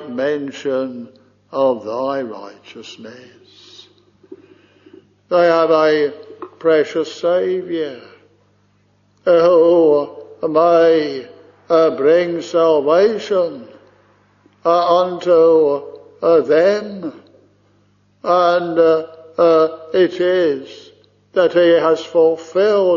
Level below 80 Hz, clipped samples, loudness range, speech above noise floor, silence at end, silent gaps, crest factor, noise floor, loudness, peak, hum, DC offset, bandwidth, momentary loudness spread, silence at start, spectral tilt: -64 dBFS; under 0.1%; 9 LU; 43 dB; 0 s; none; 14 dB; -57 dBFS; -15 LUFS; -2 dBFS; 50 Hz at -55 dBFS; under 0.1%; 7.2 kHz; 17 LU; 0 s; -4 dB/octave